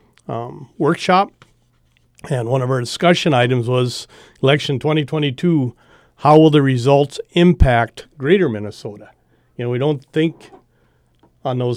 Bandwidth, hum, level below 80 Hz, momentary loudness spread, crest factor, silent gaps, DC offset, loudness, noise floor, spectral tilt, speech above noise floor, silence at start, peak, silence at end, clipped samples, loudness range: 12.5 kHz; none; -32 dBFS; 15 LU; 18 dB; none; under 0.1%; -17 LUFS; -58 dBFS; -6.5 dB/octave; 42 dB; 0.3 s; 0 dBFS; 0 s; under 0.1%; 6 LU